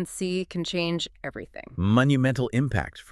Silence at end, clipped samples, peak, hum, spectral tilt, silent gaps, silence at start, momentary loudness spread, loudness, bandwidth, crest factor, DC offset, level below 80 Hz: 0.1 s; under 0.1%; -8 dBFS; none; -6 dB/octave; none; 0 s; 15 LU; -25 LUFS; 12.5 kHz; 18 dB; under 0.1%; -48 dBFS